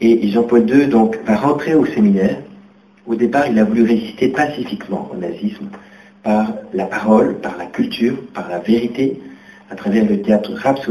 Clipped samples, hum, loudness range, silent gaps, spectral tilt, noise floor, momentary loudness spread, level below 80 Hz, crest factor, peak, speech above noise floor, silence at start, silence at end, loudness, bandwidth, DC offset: under 0.1%; none; 4 LU; none; -7.5 dB/octave; -45 dBFS; 12 LU; -52 dBFS; 16 dB; 0 dBFS; 30 dB; 0 s; 0 s; -16 LUFS; 11.5 kHz; under 0.1%